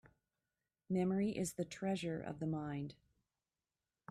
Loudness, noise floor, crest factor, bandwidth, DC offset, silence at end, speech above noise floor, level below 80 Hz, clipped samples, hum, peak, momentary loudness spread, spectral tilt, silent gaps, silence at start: -41 LUFS; under -90 dBFS; 16 dB; 13.5 kHz; under 0.1%; 1.15 s; over 51 dB; -70 dBFS; under 0.1%; none; -28 dBFS; 8 LU; -6 dB/octave; none; 0.05 s